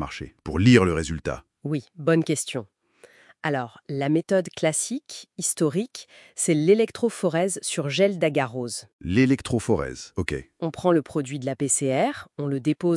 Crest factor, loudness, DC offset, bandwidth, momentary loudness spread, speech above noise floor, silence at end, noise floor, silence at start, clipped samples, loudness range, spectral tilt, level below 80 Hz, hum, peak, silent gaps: 22 dB; -24 LUFS; under 0.1%; 12 kHz; 12 LU; 31 dB; 0 s; -55 dBFS; 0 s; under 0.1%; 4 LU; -5 dB/octave; -50 dBFS; none; -2 dBFS; 8.93-8.99 s